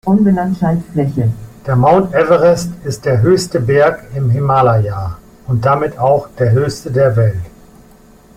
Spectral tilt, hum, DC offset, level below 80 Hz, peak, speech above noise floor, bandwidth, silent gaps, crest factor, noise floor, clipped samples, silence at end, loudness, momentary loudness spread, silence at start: -7.5 dB/octave; none; under 0.1%; -40 dBFS; 0 dBFS; 30 dB; 15 kHz; none; 12 dB; -43 dBFS; under 0.1%; 0.85 s; -13 LUFS; 9 LU; 0.05 s